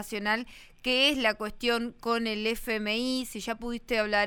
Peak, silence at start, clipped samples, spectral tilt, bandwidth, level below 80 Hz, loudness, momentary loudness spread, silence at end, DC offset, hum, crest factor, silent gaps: -10 dBFS; 0 s; under 0.1%; -3 dB/octave; 19.5 kHz; -52 dBFS; -28 LUFS; 11 LU; 0 s; under 0.1%; none; 18 dB; none